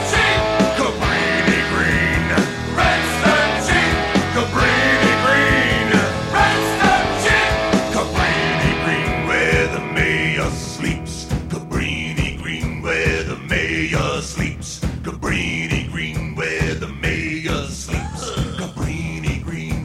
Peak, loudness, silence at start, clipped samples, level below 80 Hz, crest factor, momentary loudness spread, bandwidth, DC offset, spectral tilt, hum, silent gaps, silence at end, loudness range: -2 dBFS; -18 LUFS; 0 s; under 0.1%; -32 dBFS; 16 dB; 10 LU; 15.5 kHz; under 0.1%; -4.5 dB/octave; none; none; 0 s; 7 LU